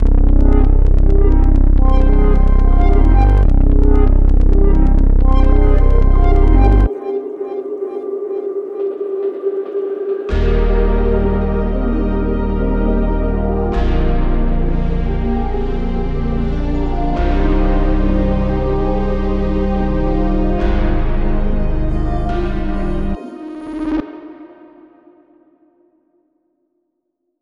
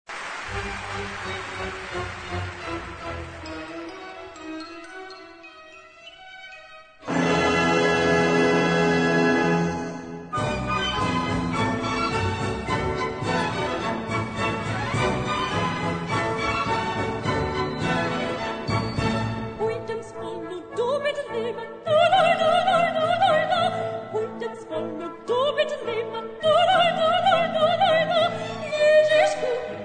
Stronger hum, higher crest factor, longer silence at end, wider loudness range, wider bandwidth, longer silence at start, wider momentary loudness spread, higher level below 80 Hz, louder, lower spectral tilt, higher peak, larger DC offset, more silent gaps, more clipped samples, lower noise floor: neither; about the same, 12 dB vs 16 dB; first, 2.95 s vs 0 s; second, 8 LU vs 12 LU; second, 4.2 kHz vs 9.4 kHz; about the same, 0 s vs 0.1 s; second, 8 LU vs 16 LU; first, -14 dBFS vs -46 dBFS; first, -17 LUFS vs -24 LUFS; first, -10 dB/octave vs -5 dB/octave; first, 0 dBFS vs -8 dBFS; neither; neither; neither; first, -71 dBFS vs -46 dBFS